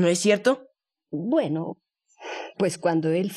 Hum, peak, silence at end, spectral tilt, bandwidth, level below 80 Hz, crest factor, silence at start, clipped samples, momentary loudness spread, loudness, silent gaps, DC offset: none; -6 dBFS; 0 s; -5 dB/octave; 13.5 kHz; -76 dBFS; 18 dB; 0 s; under 0.1%; 16 LU; -24 LUFS; none; under 0.1%